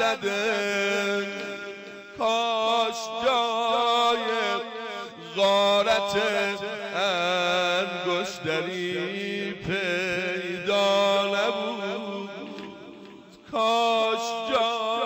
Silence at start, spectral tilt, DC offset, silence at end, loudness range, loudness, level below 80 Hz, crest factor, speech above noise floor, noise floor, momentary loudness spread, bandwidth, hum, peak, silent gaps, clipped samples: 0 s; -3 dB/octave; under 0.1%; 0 s; 3 LU; -25 LUFS; -64 dBFS; 12 dB; 21 dB; -47 dBFS; 13 LU; 16 kHz; none; -14 dBFS; none; under 0.1%